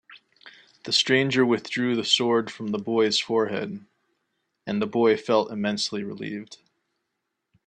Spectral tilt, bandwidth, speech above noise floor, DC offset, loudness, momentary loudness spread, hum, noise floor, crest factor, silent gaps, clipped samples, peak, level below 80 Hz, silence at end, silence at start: -4 dB/octave; 11 kHz; 56 dB; under 0.1%; -24 LUFS; 14 LU; none; -80 dBFS; 20 dB; none; under 0.1%; -6 dBFS; -70 dBFS; 1.1 s; 0.1 s